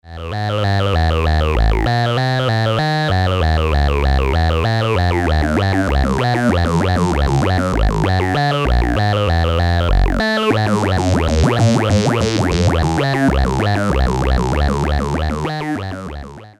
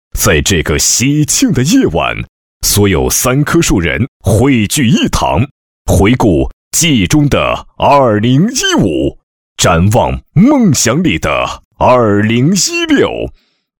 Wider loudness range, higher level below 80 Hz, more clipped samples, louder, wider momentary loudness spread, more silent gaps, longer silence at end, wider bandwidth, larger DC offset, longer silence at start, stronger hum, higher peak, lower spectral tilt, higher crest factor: about the same, 1 LU vs 1 LU; first, -22 dBFS vs -28 dBFS; neither; second, -16 LUFS vs -10 LUFS; second, 4 LU vs 7 LU; second, none vs 2.29-2.61 s, 4.08-4.20 s, 5.51-5.85 s, 6.53-6.71 s, 9.23-9.56 s, 11.65-11.71 s; second, 0.1 s vs 0.5 s; second, 12.5 kHz vs 19.5 kHz; neither; about the same, 0.05 s vs 0.15 s; neither; about the same, -2 dBFS vs 0 dBFS; first, -6.5 dB/octave vs -4.5 dB/octave; about the same, 12 dB vs 10 dB